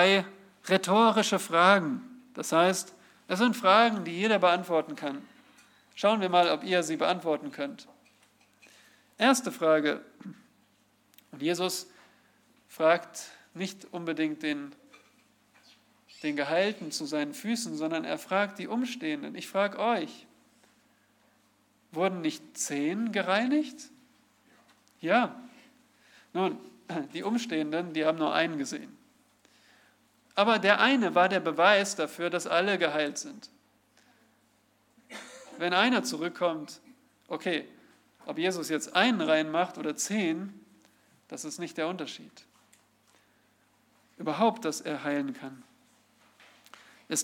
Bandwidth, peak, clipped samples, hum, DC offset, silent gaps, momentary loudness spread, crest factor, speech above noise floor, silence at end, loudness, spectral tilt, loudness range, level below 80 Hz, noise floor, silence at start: 18 kHz; -6 dBFS; under 0.1%; none; under 0.1%; none; 19 LU; 24 dB; 40 dB; 0 s; -28 LUFS; -3.5 dB/octave; 9 LU; -86 dBFS; -68 dBFS; 0 s